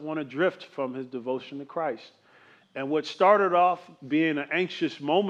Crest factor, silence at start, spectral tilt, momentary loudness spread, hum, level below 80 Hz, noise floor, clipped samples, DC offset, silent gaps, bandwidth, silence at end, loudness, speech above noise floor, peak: 20 dB; 0 s; -6 dB/octave; 14 LU; none; -88 dBFS; -57 dBFS; under 0.1%; under 0.1%; none; 8.2 kHz; 0 s; -27 LUFS; 31 dB; -8 dBFS